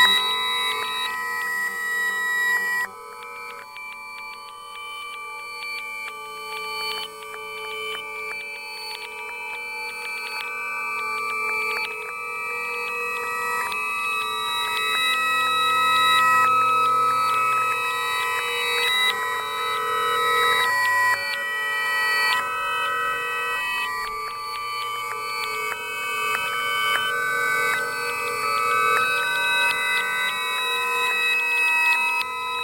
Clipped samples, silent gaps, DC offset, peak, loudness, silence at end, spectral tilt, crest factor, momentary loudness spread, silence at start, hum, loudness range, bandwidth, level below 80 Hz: under 0.1%; none; under 0.1%; -6 dBFS; -22 LUFS; 0 s; 0 dB/octave; 18 dB; 13 LU; 0 s; none; 11 LU; 16.5 kHz; -64 dBFS